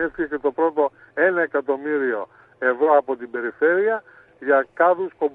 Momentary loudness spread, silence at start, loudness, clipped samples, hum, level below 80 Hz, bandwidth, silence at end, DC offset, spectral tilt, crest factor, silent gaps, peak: 10 LU; 0 s; -21 LUFS; under 0.1%; none; -62 dBFS; 4 kHz; 0.05 s; under 0.1%; -8 dB/octave; 16 dB; none; -4 dBFS